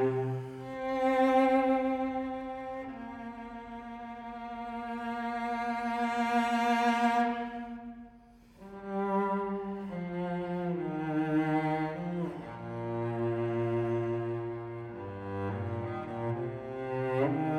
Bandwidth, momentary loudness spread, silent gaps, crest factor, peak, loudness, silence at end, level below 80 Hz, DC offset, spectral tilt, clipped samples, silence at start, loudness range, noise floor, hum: 15 kHz; 15 LU; none; 18 dB; -14 dBFS; -32 LUFS; 0 s; -62 dBFS; under 0.1%; -7.5 dB/octave; under 0.1%; 0 s; 6 LU; -57 dBFS; none